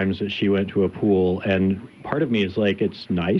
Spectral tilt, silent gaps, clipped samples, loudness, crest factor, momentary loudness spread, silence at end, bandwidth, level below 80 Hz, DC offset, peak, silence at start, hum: -8.5 dB/octave; none; under 0.1%; -22 LUFS; 14 dB; 5 LU; 0 s; 6.2 kHz; -58 dBFS; under 0.1%; -8 dBFS; 0 s; none